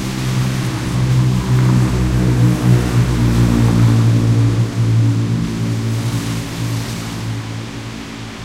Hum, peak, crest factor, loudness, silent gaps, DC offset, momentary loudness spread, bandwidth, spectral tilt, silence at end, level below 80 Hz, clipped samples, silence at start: none; 0 dBFS; 14 dB; -16 LUFS; none; under 0.1%; 11 LU; 15 kHz; -6.5 dB/octave; 0 s; -28 dBFS; under 0.1%; 0 s